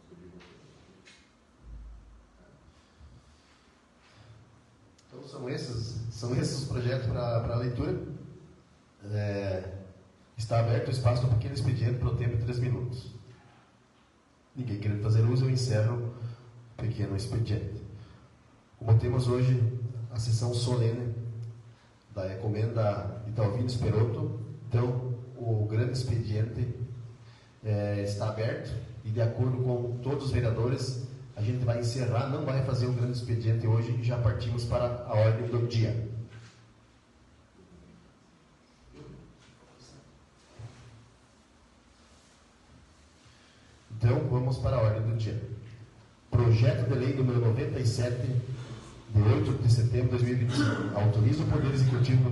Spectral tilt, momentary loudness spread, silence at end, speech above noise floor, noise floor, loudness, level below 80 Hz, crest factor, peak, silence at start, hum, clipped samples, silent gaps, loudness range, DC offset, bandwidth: -7.5 dB/octave; 17 LU; 0 s; 35 dB; -63 dBFS; -29 LUFS; -52 dBFS; 18 dB; -12 dBFS; 0.1 s; none; under 0.1%; none; 6 LU; under 0.1%; 11.5 kHz